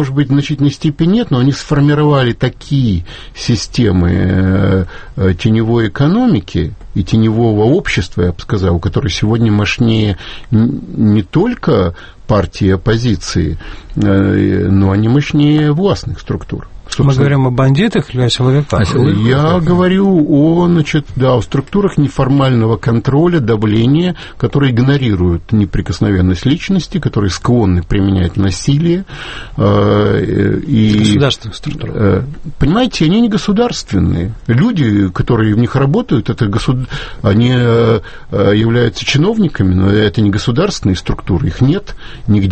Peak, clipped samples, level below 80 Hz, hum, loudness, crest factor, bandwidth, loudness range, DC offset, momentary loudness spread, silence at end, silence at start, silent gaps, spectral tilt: 0 dBFS; under 0.1%; -30 dBFS; none; -12 LUFS; 12 dB; 8.8 kHz; 2 LU; under 0.1%; 7 LU; 0 s; 0 s; none; -7 dB/octave